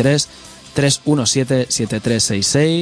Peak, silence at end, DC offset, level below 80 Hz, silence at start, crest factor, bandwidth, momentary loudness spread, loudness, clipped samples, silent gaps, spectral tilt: -2 dBFS; 0 s; under 0.1%; -46 dBFS; 0 s; 14 dB; 11 kHz; 4 LU; -16 LUFS; under 0.1%; none; -4 dB/octave